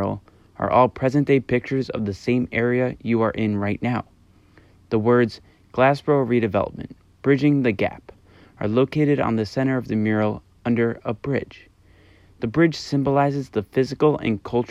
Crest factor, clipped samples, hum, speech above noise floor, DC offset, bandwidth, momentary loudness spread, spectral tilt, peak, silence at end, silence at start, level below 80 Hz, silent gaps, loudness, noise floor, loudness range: 18 dB; under 0.1%; none; 32 dB; under 0.1%; 10.5 kHz; 10 LU; -8 dB/octave; -4 dBFS; 0.05 s; 0 s; -52 dBFS; none; -22 LUFS; -53 dBFS; 3 LU